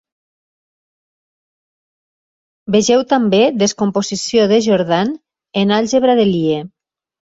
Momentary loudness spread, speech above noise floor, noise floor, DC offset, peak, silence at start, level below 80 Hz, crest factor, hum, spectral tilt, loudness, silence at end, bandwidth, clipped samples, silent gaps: 9 LU; over 76 dB; under -90 dBFS; under 0.1%; -2 dBFS; 2.7 s; -56 dBFS; 16 dB; none; -5 dB/octave; -15 LUFS; 0.7 s; 8 kHz; under 0.1%; none